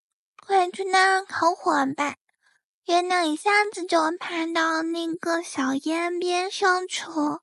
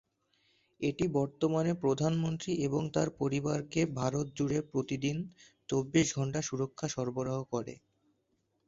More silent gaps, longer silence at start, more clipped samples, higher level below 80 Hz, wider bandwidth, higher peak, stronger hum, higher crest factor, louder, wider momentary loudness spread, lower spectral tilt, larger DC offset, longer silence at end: first, 2.21-2.27 s, 2.64-2.82 s vs none; second, 0.5 s vs 0.8 s; neither; second, -78 dBFS vs -62 dBFS; first, 12 kHz vs 7.8 kHz; first, -6 dBFS vs -14 dBFS; neither; about the same, 18 dB vs 20 dB; first, -24 LUFS vs -33 LUFS; about the same, 7 LU vs 6 LU; second, -2 dB/octave vs -6 dB/octave; neither; second, 0.05 s vs 0.9 s